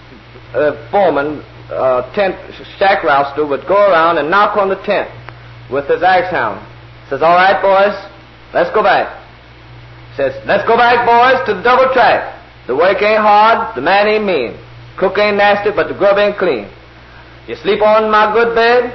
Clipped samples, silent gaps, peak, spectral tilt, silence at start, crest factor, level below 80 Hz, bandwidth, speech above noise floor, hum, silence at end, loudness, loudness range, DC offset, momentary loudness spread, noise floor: under 0.1%; none; 0 dBFS; -6 dB/octave; 0.1 s; 12 dB; -44 dBFS; 6.2 kHz; 26 dB; none; 0 s; -12 LUFS; 4 LU; under 0.1%; 14 LU; -37 dBFS